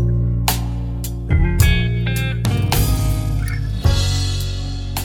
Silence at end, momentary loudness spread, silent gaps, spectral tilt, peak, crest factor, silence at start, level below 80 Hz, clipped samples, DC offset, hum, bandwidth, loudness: 0 s; 9 LU; none; -5 dB/octave; 0 dBFS; 18 dB; 0 s; -22 dBFS; under 0.1%; under 0.1%; none; 18.5 kHz; -19 LUFS